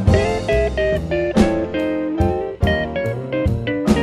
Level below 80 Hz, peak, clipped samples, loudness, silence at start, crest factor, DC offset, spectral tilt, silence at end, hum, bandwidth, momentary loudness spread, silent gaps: -28 dBFS; -2 dBFS; under 0.1%; -19 LUFS; 0 s; 16 dB; under 0.1%; -7 dB/octave; 0 s; none; 14 kHz; 5 LU; none